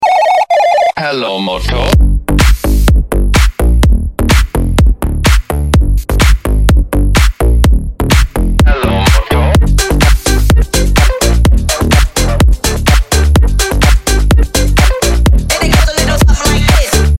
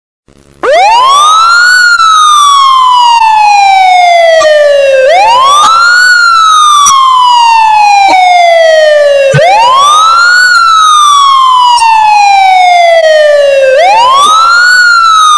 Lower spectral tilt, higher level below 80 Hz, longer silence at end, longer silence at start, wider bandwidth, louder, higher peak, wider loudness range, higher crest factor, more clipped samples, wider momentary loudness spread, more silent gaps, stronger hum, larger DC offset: first, -5 dB/octave vs -1 dB/octave; first, -10 dBFS vs -44 dBFS; about the same, 0 s vs 0 s; second, 0 s vs 0.65 s; first, 16.5 kHz vs 11 kHz; second, -11 LUFS vs -2 LUFS; about the same, 0 dBFS vs 0 dBFS; about the same, 1 LU vs 1 LU; about the same, 8 dB vs 4 dB; second, under 0.1% vs 7%; about the same, 3 LU vs 2 LU; neither; neither; second, under 0.1% vs 1%